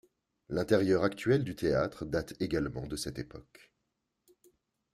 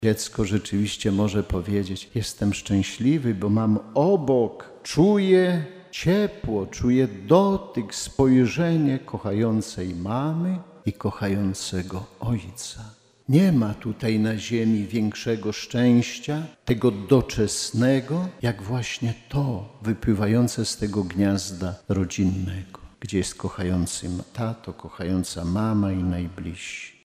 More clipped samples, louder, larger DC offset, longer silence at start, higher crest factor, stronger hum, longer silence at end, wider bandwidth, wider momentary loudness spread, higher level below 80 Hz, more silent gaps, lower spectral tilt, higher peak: neither; second, -32 LUFS vs -24 LUFS; neither; first, 0.5 s vs 0 s; about the same, 22 dB vs 20 dB; neither; first, 1.5 s vs 0.15 s; about the same, 14.5 kHz vs 15.5 kHz; about the same, 11 LU vs 11 LU; second, -56 dBFS vs -46 dBFS; neither; about the same, -6 dB/octave vs -6 dB/octave; second, -12 dBFS vs -4 dBFS